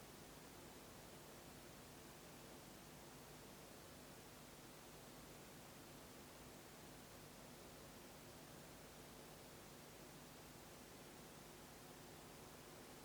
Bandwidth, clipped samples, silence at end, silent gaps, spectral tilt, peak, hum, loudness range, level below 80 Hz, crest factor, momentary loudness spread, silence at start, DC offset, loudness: over 20 kHz; under 0.1%; 0 s; none; -3.5 dB/octave; -44 dBFS; none; 0 LU; -74 dBFS; 14 dB; 0 LU; 0 s; under 0.1%; -59 LUFS